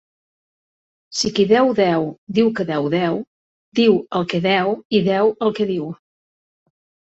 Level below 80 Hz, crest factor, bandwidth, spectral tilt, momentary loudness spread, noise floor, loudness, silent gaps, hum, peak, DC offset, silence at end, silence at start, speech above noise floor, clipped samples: -58 dBFS; 18 dB; 8.2 kHz; -5.5 dB/octave; 11 LU; under -90 dBFS; -19 LUFS; 2.18-2.27 s, 3.27-3.72 s, 4.85-4.90 s; none; -2 dBFS; under 0.1%; 1.15 s; 1.1 s; over 72 dB; under 0.1%